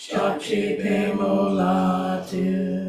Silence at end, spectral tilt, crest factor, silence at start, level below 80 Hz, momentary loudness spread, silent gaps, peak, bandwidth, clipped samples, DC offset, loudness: 0 s; -7 dB/octave; 14 dB; 0 s; -56 dBFS; 4 LU; none; -8 dBFS; 13 kHz; under 0.1%; under 0.1%; -23 LUFS